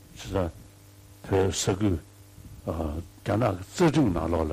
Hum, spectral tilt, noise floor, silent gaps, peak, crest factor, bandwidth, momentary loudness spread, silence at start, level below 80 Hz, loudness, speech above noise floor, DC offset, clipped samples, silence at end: none; -6 dB/octave; -51 dBFS; none; -14 dBFS; 14 dB; 15.5 kHz; 12 LU; 0.15 s; -44 dBFS; -27 LUFS; 25 dB; under 0.1%; under 0.1%; 0 s